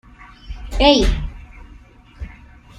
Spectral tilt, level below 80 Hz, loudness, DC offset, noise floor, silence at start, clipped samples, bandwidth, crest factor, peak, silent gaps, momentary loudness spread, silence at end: -5 dB/octave; -26 dBFS; -16 LUFS; under 0.1%; -44 dBFS; 0.2 s; under 0.1%; 11.5 kHz; 20 dB; -2 dBFS; none; 24 LU; 0.5 s